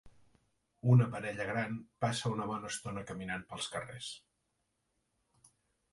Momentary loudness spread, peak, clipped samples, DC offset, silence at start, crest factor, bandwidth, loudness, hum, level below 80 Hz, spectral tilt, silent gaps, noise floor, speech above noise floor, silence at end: 15 LU; -16 dBFS; under 0.1%; under 0.1%; 0.05 s; 22 dB; 11.5 kHz; -35 LUFS; none; -66 dBFS; -5.5 dB/octave; none; -82 dBFS; 47 dB; 1.75 s